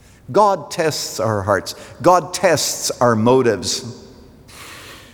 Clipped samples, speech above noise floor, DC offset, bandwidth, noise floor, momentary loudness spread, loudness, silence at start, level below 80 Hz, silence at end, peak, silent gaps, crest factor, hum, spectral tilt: under 0.1%; 25 dB; under 0.1%; over 20 kHz; -42 dBFS; 20 LU; -17 LUFS; 0.3 s; -54 dBFS; 0.1 s; -2 dBFS; none; 16 dB; none; -4 dB/octave